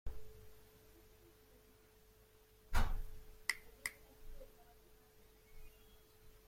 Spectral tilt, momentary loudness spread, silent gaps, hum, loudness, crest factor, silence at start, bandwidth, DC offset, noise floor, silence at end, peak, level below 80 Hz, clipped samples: -3 dB/octave; 25 LU; none; none; -45 LUFS; 26 dB; 0.05 s; 16.5 kHz; under 0.1%; -67 dBFS; 0.1 s; -18 dBFS; -48 dBFS; under 0.1%